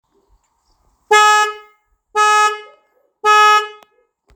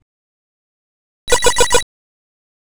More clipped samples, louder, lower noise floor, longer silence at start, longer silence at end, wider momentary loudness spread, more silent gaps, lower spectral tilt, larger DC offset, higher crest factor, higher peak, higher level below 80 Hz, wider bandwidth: neither; about the same, -12 LUFS vs -14 LUFS; second, -61 dBFS vs under -90 dBFS; first, 1.1 s vs 0 s; second, 0.65 s vs 0.95 s; second, 13 LU vs 20 LU; second, none vs 0.02-1.27 s; second, 2.5 dB/octave vs -1 dB/octave; neither; about the same, 16 dB vs 18 dB; about the same, 0 dBFS vs 0 dBFS; second, -66 dBFS vs -34 dBFS; about the same, over 20 kHz vs over 20 kHz